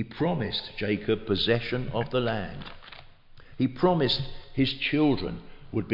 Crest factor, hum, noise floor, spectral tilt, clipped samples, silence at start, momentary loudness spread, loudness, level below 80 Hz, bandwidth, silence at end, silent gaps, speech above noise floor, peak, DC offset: 18 dB; none; -49 dBFS; -8 dB/octave; under 0.1%; 0 s; 14 LU; -27 LUFS; -46 dBFS; 5.8 kHz; 0 s; none; 22 dB; -10 dBFS; under 0.1%